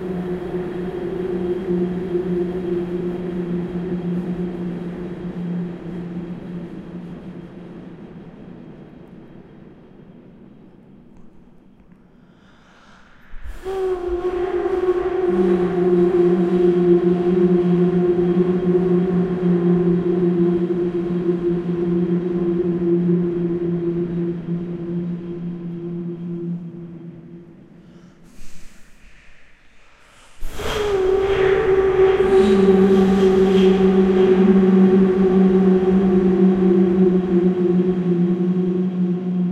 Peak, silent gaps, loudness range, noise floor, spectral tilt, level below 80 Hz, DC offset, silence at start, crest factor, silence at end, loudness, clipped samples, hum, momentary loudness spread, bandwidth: -2 dBFS; none; 18 LU; -49 dBFS; -9 dB/octave; -42 dBFS; under 0.1%; 0 s; 16 dB; 0 s; -18 LUFS; under 0.1%; none; 17 LU; 8 kHz